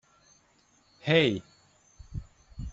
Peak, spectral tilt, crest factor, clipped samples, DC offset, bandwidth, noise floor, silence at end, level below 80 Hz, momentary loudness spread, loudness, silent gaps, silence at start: -8 dBFS; -6 dB/octave; 24 dB; under 0.1%; under 0.1%; 8 kHz; -65 dBFS; 0 s; -50 dBFS; 20 LU; -26 LUFS; none; 1.05 s